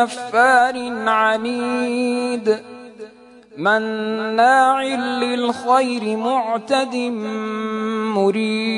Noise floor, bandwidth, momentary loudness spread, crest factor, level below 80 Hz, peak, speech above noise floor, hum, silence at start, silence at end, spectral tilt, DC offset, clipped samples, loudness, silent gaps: -44 dBFS; 11 kHz; 10 LU; 16 dB; -70 dBFS; -2 dBFS; 26 dB; none; 0 s; 0 s; -4.5 dB/octave; under 0.1%; under 0.1%; -19 LUFS; none